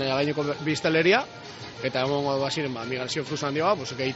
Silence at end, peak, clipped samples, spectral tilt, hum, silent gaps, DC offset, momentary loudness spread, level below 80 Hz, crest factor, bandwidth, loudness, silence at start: 0 s; -8 dBFS; under 0.1%; -3.5 dB/octave; none; none; under 0.1%; 9 LU; -62 dBFS; 18 dB; 8 kHz; -26 LUFS; 0 s